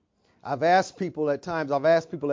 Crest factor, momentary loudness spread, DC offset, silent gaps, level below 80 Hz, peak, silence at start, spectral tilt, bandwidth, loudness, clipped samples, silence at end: 16 dB; 10 LU; under 0.1%; none; -66 dBFS; -8 dBFS; 0.45 s; -5.5 dB/octave; 7.6 kHz; -25 LUFS; under 0.1%; 0 s